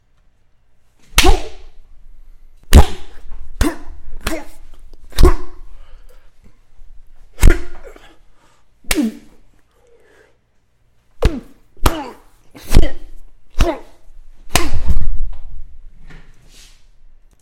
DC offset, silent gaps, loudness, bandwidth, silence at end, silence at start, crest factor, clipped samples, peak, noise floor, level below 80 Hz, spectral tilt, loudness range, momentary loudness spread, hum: under 0.1%; none; -18 LUFS; 16.5 kHz; 1.6 s; 1.15 s; 14 dB; under 0.1%; 0 dBFS; -56 dBFS; -18 dBFS; -4.5 dB/octave; 7 LU; 27 LU; none